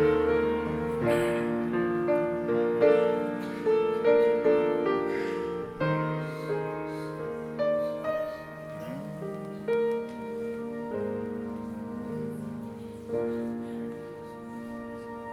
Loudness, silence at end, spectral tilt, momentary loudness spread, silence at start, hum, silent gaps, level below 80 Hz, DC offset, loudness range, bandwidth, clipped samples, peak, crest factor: -29 LUFS; 0 s; -7.5 dB/octave; 15 LU; 0 s; none; none; -56 dBFS; under 0.1%; 10 LU; 13.5 kHz; under 0.1%; -10 dBFS; 18 dB